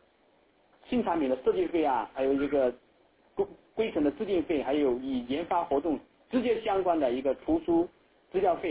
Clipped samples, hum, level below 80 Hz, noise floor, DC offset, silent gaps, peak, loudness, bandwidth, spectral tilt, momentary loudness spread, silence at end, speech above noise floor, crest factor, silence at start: under 0.1%; none; -58 dBFS; -65 dBFS; under 0.1%; none; -14 dBFS; -29 LUFS; 4 kHz; -4.5 dB/octave; 7 LU; 0 s; 37 dB; 14 dB; 0.9 s